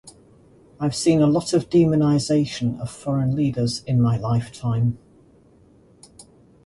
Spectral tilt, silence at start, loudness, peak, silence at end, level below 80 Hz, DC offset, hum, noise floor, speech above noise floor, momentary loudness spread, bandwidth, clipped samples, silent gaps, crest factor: -7 dB/octave; 0.05 s; -21 LUFS; -6 dBFS; 0.45 s; -50 dBFS; under 0.1%; none; -53 dBFS; 33 dB; 8 LU; 11.5 kHz; under 0.1%; none; 16 dB